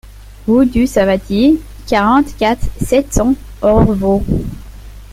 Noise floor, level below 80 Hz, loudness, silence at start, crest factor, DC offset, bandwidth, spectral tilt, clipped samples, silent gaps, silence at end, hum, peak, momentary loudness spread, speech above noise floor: -32 dBFS; -26 dBFS; -14 LUFS; 0.05 s; 12 dB; under 0.1%; 16 kHz; -6.5 dB/octave; under 0.1%; none; 0 s; none; 0 dBFS; 8 LU; 20 dB